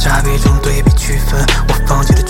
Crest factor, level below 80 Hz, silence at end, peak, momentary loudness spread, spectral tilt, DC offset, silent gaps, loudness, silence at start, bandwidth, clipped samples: 10 dB; -12 dBFS; 0 s; 0 dBFS; 2 LU; -5 dB/octave; under 0.1%; none; -13 LUFS; 0 s; 17 kHz; under 0.1%